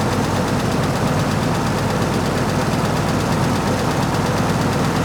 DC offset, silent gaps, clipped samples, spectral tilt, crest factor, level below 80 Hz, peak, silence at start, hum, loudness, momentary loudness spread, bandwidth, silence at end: under 0.1%; none; under 0.1%; -5.5 dB/octave; 12 dB; -36 dBFS; -6 dBFS; 0 s; none; -19 LUFS; 1 LU; over 20 kHz; 0 s